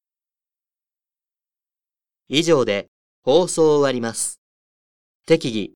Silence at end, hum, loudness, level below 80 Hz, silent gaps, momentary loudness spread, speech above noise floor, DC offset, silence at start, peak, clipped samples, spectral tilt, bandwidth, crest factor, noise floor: 0.1 s; none; -19 LUFS; -60 dBFS; 2.88-3.22 s, 4.38-5.20 s; 9 LU; over 72 dB; under 0.1%; 2.3 s; -2 dBFS; under 0.1%; -4 dB/octave; 18.5 kHz; 20 dB; under -90 dBFS